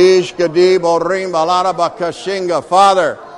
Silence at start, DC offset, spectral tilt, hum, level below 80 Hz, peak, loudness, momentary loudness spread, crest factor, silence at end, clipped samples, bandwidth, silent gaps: 0 s; under 0.1%; -4.5 dB/octave; none; -54 dBFS; 0 dBFS; -13 LUFS; 8 LU; 12 dB; 0 s; under 0.1%; 11 kHz; none